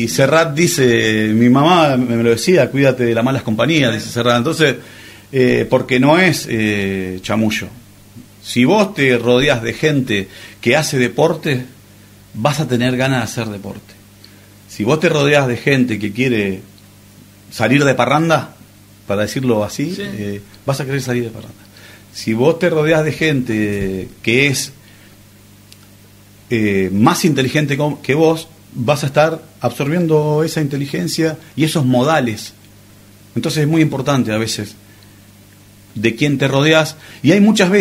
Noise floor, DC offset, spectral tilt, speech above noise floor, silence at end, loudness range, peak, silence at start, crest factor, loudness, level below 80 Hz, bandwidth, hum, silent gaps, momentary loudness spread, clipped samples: -44 dBFS; under 0.1%; -5.5 dB/octave; 29 dB; 0 s; 6 LU; 0 dBFS; 0 s; 16 dB; -15 LUFS; -48 dBFS; 16 kHz; 50 Hz at -40 dBFS; none; 12 LU; under 0.1%